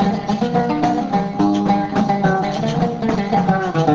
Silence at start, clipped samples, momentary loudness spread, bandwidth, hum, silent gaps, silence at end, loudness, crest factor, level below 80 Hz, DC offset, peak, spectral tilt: 0 s; under 0.1%; 3 LU; 7.6 kHz; none; none; 0 s; -18 LUFS; 14 dB; -44 dBFS; under 0.1%; -4 dBFS; -7.5 dB/octave